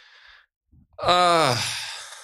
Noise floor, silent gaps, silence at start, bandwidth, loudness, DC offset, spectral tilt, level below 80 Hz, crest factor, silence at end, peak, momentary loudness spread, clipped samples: -52 dBFS; none; 1 s; 15.5 kHz; -21 LUFS; under 0.1%; -3 dB/octave; -56 dBFS; 20 dB; 0 s; -4 dBFS; 12 LU; under 0.1%